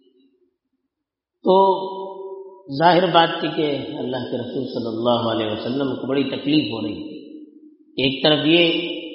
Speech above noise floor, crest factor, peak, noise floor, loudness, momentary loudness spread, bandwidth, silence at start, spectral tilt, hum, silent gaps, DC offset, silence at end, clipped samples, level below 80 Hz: 63 dB; 20 dB; -2 dBFS; -82 dBFS; -20 LUFS; 17 LU; 5.8 kHz; 1.45 s; -3 dB/octave; none; none; under 0.1%; 0 s; under 0.1%; -60 dBFS